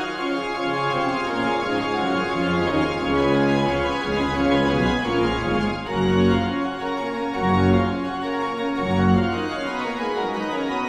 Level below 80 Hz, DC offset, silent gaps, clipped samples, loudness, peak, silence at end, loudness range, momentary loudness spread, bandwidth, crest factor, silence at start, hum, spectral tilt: -42 dBFS; under 0.1%; none; under 0.1%; -22 LUFS; -6 dBFS; 0 s; 1 LU; 7 LU; 11 kHz; 16 dB; 0 s; none; -6.5 dB/octave